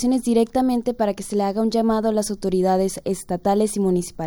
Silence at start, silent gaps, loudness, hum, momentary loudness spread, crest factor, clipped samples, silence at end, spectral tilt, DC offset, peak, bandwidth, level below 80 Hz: 0 s; none; -21 LUFS; none; 5 LU; 14 dB; under 0.1%; 0 s; -6 dB/octave; under 0.1%; -6 dBFS; 18 kHz; -46 dBFS